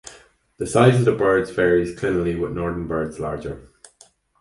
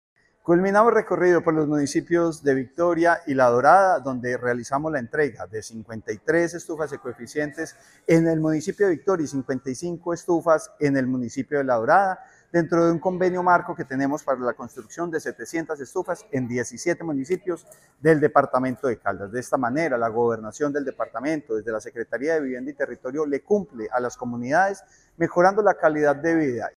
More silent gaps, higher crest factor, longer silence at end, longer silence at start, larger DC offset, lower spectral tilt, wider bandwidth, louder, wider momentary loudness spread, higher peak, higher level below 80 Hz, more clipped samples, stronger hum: neither; about the same, 20 dB vs 20 dB; first, 0.8 s vs 0.05 s; second, 0.05 s vs 0.45 s; neither; about the same, -6.5 dB/octave vs -6.5 dB/octave; second, 11.5 kHz vs 13 kHz; first, -20 LUFS vs -23 LUFS; first, 15 LU vs 12 LU; about the same, 0 dBFS vs -2 dBFS; first, -44 dBFS vs -62 dBFS; neither; neither